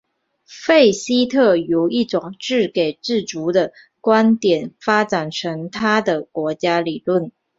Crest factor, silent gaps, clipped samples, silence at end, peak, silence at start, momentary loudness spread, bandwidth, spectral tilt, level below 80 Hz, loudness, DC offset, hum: 16 dB; none; under 0.1%; 0.3 s; -2 dBFS; 0.5 s; 9 LU; 7.8 kHz; -5 dB/octave; -62 dBFS; -18 LUFS; under 0.1%; none